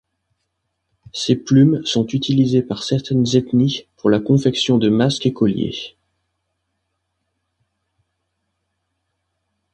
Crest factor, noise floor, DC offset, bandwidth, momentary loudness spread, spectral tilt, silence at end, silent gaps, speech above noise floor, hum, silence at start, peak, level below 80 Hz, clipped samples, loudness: 18 dB; -74 dBFS; under 0.1%; 9.4 kHz; 9 LU; -6.5 dB/octave; 3.85 s; none; 57 dB; none; 1.15 s; -2 dBFS; -54 dBFS; under 0.1%; -17 LUFS